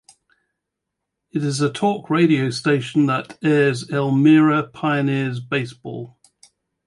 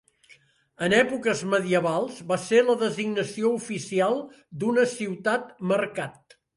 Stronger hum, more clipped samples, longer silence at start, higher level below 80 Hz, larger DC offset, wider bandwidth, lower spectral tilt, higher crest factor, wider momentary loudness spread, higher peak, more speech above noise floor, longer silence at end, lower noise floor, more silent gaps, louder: neither; neither; first, 1.35 s vs 0.8 s; about the same, -64 dBFS vs -68 dBFS; neither; about the same, 11.5 kHz vs 11.5 kHz; first, -6.5 dB/octave vs -5 dB/octave; about the same, 16 dB vs 18 dB; first, 15 LU vs 9 LU; first, -4 dBFS vs -8 dBFS; first, 62 dB vs 33 dB; first, 0.8 s vs 0.45 s; first, -81 dBFS vs -58 dBFS; neither; first, -19 LUFS vs -25 LUFS